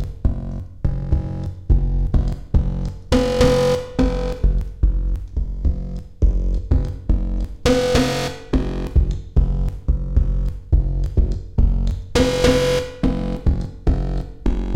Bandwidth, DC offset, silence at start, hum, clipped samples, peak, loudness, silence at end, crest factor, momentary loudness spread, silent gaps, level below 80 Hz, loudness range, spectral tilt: 12.5 kHz; 0.8%; 0 s; none; under 0.1%; -4 dBFS; -21 LUFS; 0 s; 14 dB; 9 LU; none; -20 dBFS; 3 LU; -6.5 dB/octave